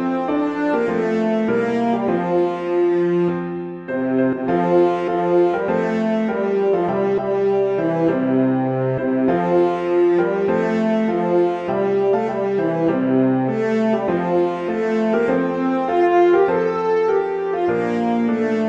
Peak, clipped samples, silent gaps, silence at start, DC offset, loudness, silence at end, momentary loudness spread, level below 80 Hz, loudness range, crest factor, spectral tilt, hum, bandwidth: -4 dBFS; under 0.1%; none; 0 s; under 0.1%; -19 LUFS; 0 s; 4 LU; -58 dBFS; 1 LU; 14 dB; -8.5 dB/octave; none; 7.6 kHz